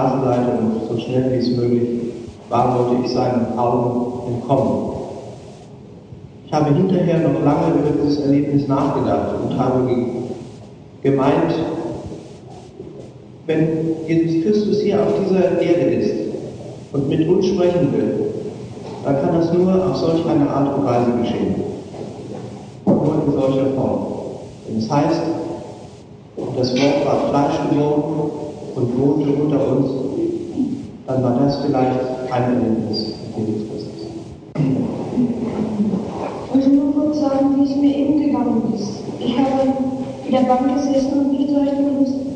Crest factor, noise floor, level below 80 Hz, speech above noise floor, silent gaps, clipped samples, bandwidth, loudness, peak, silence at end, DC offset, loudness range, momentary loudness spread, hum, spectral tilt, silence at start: 16 dB; -39 dBFS; -50 dBFS; 22 dB; none; under 0.1%; 9.2 kHz; -19 LUFS; -2 dBFS; 0 s; under 0.1%; 4 LU; 15 LU; none; -8 dB/octave; 0 s